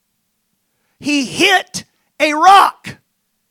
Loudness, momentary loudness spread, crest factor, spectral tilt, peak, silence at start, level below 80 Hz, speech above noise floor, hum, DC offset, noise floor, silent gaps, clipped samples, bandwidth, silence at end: -12 LUFS; 20 LU; 16 dB; -2 dB/octave; 0 dBFS; 1 s; -60 dBFS; 56 dB; none; under 0.1%; -68 dBFS; none; 0.5%; 17 kHz; 0.6 s